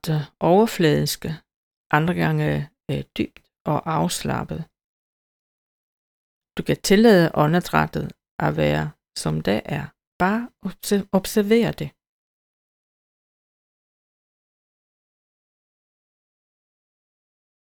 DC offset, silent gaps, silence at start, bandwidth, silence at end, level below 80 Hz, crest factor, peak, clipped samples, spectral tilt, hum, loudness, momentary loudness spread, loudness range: under 0.1%; 1.56-1.90 s, 3.60-3.65 s, 4.84-6.41 s, 8.31-8.39 s, 10.07-10.20 s; 0.05 s; 20 kHz; 5.85 s; -50 dBFS; 22 dB; -2 dBFS; under 0.1%; -5.5 dB/octave; none; -21 LUFS; 16 LU; 8 LU